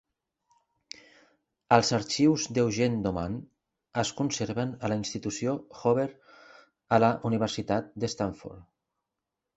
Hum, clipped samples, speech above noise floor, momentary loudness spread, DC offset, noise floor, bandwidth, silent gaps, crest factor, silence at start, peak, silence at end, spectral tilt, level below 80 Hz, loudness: none; under 0.1%; 59 dB; 13 LU; under 0.1%; -87 dBFS; 8.2 kHz; none; 26 dB; 1.7 s; -4 dBFS; 0.95 s; -5 dB/octave; -58 dBFS; -28 LUFS